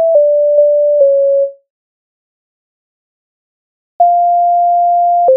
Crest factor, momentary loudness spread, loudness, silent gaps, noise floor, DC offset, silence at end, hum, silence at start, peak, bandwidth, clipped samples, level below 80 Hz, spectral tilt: 12 dB; 3 LU; -10 LUFS; 1.70-3.99 s; under -90 dBFS; under 0.1%; 0 s; none; 0 s; 0 dBFS; 1.1 kHz; under 0.1%; -74 dBFS; 0 dB/octave